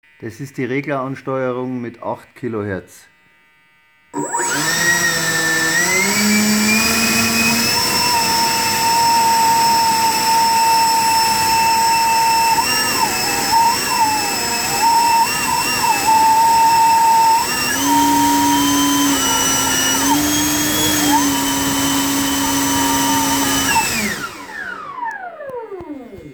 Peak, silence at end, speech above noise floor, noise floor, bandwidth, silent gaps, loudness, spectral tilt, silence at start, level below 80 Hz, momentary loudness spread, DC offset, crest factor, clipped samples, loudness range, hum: -2 dBFS; 0 s; 30 dB; -54 dBFS; over 20 kHz; none; -14 LUFS; -2 dB/octave; 0.2 s; -46 dBFS; 13 LU; under 0.1%; 14 dB; under 0.1%; 7 LU; none